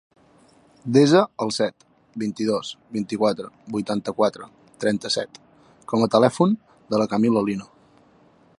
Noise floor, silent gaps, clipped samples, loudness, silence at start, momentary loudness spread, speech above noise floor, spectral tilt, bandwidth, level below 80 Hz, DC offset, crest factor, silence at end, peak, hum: -56 dBFS; none; under 0.1%; -22 LUFS; 0.85 s; 13 LU; 34 dB; -5.5 dB/octave; 11.5 kHz; -64 dBFS; under 0.1%; 20 dB; 0.95 s; -2 dBFS; none